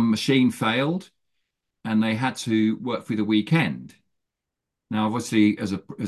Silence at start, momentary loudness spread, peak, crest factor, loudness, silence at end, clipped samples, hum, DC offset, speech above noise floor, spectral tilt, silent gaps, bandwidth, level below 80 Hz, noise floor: 0 s; 9 LU; -8 dBFS; 16 dB; -23 LUFS; 0 s; under 0.1%; none; under 0.1%; 62 dB; -5.5 dB/octave; none; 12.5 kHz; -60 dBFS; -85 dBFS